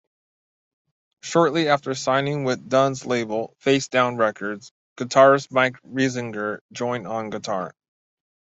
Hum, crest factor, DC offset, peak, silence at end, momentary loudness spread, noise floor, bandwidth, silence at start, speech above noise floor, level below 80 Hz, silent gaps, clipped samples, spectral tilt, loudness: none; 20 dB; under 0.1%; -4 dBFS; 0.9 s; 12 LU; under -90 dBFS; 8.2 kHz; 1.25 s; over 68 dB; -66 dBFS; 4.71-4.96 s, 6.61-6.69 s; under 0.1%; -5 dB/octave; -22 LUFS